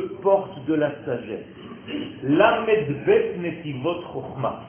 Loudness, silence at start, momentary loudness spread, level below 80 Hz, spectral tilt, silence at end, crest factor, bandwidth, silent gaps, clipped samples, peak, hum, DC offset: -23 LUFS; 0 s; 15 LU; -56 dBFS; -10.5 dB/octave; 0 s; 20 dB; 3.4 kHz; none; under 0.1%; -4 dBFS; none; under 0.1%